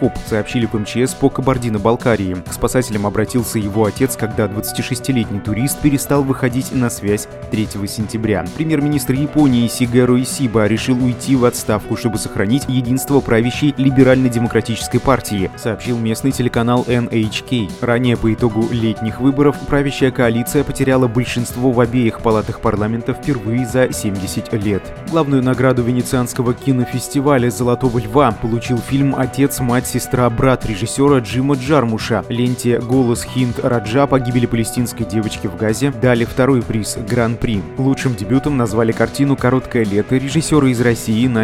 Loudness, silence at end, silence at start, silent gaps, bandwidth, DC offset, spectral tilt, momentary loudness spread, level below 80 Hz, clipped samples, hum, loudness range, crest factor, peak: -16 LUFS; 0 s; 0 s; none; 16 kHz; under 0.1%; -6 dB/octave; 6 LU; -36 dBFS; under 0.1%; none; 3 LU; 16 dB; 0 dBFS